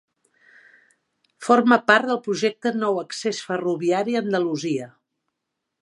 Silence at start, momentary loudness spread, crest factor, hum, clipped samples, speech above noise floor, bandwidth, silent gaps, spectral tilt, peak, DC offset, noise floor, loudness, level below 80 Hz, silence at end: 1.4 s; 11 LU; 22 dB; none; under 0.1%; 60 dB; 11.5 kHz; none; -4.5 dB/octave; 0 dBFS; under 0.1%; -81 dBFS; -21 LUFS; -76 dBFS; 0.95 s